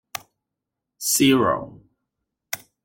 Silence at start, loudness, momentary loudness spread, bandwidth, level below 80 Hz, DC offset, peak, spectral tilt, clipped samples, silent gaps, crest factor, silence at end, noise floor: 0.15 s; -20 LUFS; 19 LU; 17 kHz; -60 dBFS; under 0.1%; -4 dBFS; -3.5 dB/octave; under 0.1%; none; 20 dB; 0.3 s; -84 dBFS